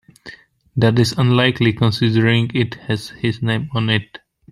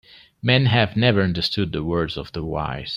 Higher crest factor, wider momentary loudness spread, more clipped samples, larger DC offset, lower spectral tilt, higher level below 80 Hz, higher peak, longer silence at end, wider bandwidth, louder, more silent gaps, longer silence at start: about the same, 16 dB vs 20 dB; about the same, 8 LU vs 10 LU; neither; neither; about the same, -6.5 dB/octave vs -7 dB/octave; second, -50 dBFS vs -44 dBFS; about the same, -2 dBFS vs -2 dBFS; first, 0.35 s vs 0 s; first, 12 kHz vs 10 kHz; first, -17 LUFS vs -21 LUFS; neither; second, 0.25 s vs 0.45 s